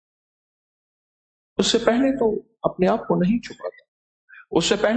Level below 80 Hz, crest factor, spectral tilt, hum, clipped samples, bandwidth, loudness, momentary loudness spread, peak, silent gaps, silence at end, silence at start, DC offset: -52 dBFS; 20 dB; -4.5 dB/octave; none; under 0.1%; 9.2 kHz; -21 LUFS; 12 LU; -4 dBFS; 3.88-4.28 s; 0 s; 1.6 s; under 0.1%